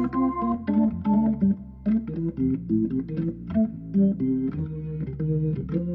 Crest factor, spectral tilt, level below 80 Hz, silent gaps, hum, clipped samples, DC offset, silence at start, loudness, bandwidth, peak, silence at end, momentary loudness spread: 12 dB; -12.5 dB/octave; -46 dBFS; none; none; under 0.1%; under 0.1%; 0 s; -26 LUFS; 3.5 kHz; -12 dBFS; 0 s; 7 LU